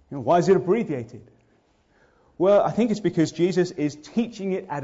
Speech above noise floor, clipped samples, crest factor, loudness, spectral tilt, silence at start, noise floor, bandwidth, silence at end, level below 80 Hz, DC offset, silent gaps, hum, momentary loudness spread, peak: 40 dB; under 0.1%; 14 dB; -23 LUFS; -7 dB/octave; 0.1 s; -63 dBFS; 7.8 kHz; 0 s; -62 dBFS; under 0.1%; none; none; 10 LU; -8 dBFS